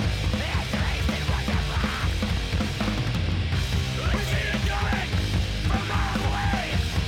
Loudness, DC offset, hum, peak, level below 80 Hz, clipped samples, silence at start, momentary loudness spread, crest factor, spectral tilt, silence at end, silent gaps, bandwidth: -26 LUFS; under 0.1%; none; -10 dBFS; -30 dBFS; under 0.1%; 0 s; 1 LU; 14 dB; -5 dB/octave; 0 s; none; 16.5 kHz